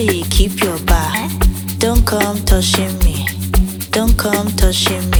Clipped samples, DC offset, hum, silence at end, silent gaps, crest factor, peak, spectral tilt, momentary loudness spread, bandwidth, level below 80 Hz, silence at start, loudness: under 0.1%; under 0.1%; none; 0 s; none; 14 dB; 0 dBFS; -4 dB/octave; 4 LU; over 20 kHz; -18 dBFS; 0 s; -15 LUFS